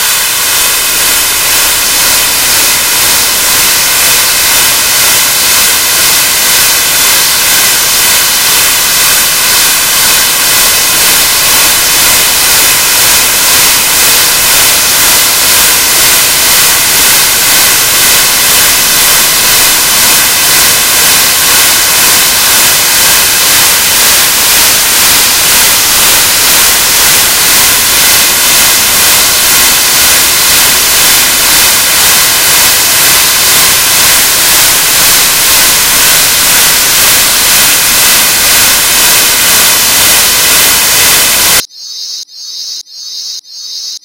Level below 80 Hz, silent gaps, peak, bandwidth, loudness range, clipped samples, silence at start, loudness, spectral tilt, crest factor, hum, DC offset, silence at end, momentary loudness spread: -34 dBFS; none; 0 dBFS; over 20 kHz; 1 LU; 4%; 0 s; -3 LUFS; 1 dB/octave; 6 dB; none; 1%; 0.05 s; 2 LU